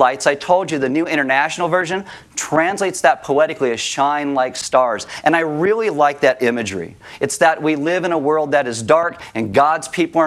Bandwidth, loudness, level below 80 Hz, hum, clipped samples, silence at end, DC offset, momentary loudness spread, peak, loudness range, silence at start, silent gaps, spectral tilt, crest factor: 14 kHz; -17 LUFS; -60 dBFS; none; under 0.1%; 0 s; under 0.1%; 8 LU; 0 dBFS; 1 LU; 0 s; none; -4 dB/octave; 16 dB